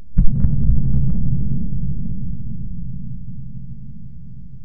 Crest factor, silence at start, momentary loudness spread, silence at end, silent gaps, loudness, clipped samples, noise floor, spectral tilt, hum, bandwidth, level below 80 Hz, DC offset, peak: 16 dB; 0 s; 18 LU; 0 s; none; -24 LUFS; under 0.1%; -37 dBFS; -14.5 dB/octave; none; 1.5 kHz; -22 dBFS; 10%; 0 dBFS